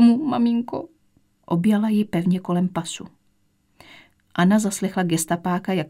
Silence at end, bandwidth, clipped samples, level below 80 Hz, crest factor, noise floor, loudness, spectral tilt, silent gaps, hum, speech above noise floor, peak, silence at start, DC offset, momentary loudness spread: 0 s; 16 kHz; under 0.1%; -64 dBFS; 16 dB; -64 dBFS; -22 LUFS; -6 dB/octave; none; none; 43 dB; -6 dBFS; 0 s; under 0.1%; 13 LU